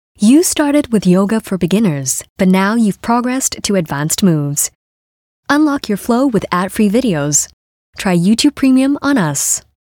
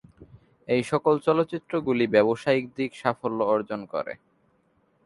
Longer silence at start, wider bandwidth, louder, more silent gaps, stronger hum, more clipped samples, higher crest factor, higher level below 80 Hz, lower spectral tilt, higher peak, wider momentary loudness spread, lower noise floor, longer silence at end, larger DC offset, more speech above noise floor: about the same, 0.2 s vs 0.2 s; first, 18.5 kHz vs 11.5 kHz; first, -14 LUFS vs -25 LUFS; first, 2.30-2.36 s, 4.75-5.43 s, 7.53-7.93 s vs none; neither; neither; second, 12 dB vs 20 dB; first, -46 dBFS vs -64 dBFS; second, -4.5 dB/octave vs -6.5 dB/octave; first, 0 dBFS vs -6 dBFS; second, 6 LU vs 11 LU; first, under -90 dBFS vs -67 dBFS; second, 0.4 s vs 0.9 s; neither; first, over 77 dB vs 42 dB